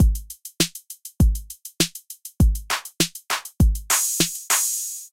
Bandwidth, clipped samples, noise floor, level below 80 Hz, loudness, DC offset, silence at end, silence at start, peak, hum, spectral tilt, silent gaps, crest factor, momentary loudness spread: 17 kHz; under 0.1%; -41 dBFS; -26 dBFS; -22 LUFS; under 0.1%; 0.05 s; 0 s; -6 dBFS; none; -3 dB/octave; none; 18 dB; 18 LU